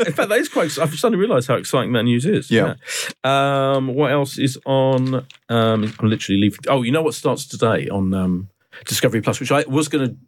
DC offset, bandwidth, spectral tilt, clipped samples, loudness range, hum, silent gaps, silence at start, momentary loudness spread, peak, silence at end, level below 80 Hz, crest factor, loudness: under 0.1%; 17.5 kHz; -5.5 dB/octave; under 0.1%; 2 LU; none; none; 0 s; 5 LU; -4 dBFS; 0.1 s; -62 dBFS; 14 dB; -19 LUFS